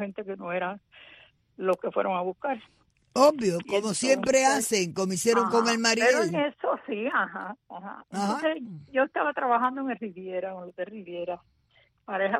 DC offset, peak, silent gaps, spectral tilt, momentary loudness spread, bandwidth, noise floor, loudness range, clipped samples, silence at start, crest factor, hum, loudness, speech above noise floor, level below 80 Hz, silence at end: under 0.1%; -8 dBFS; none; -3.5 dB/octave; 15 LU; 14 kHz; -65 dBFS; 6 LU; under 0.1%; 0 s; 20 dB; none; -27 LUFS; 38 dB; -70 dBFS; 0 s